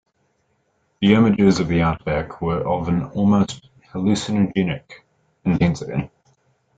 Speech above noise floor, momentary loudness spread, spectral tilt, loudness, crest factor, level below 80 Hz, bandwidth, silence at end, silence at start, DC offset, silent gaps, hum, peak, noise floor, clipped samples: 48 dB; 12 LU; -7 dB/octave; -20 LUFS; 18 dB; -46 dBFS; 9 kHz; 0.7 s; 1 s; under 0.1%; none; none; -2 dBFS; -67 dBFS; under 0.1%